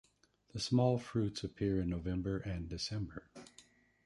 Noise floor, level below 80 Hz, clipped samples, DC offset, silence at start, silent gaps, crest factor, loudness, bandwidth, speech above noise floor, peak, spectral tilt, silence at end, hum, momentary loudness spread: -72 dBFS; -54 dBFS; under 0.1%; under 0.1%; 0.55 s; none; 20 dB; -37 LUFS; 11.5 kHz; 35 dB; -18 dBFS; -6.5 dB/octave; 0.45 s; none; 19 LU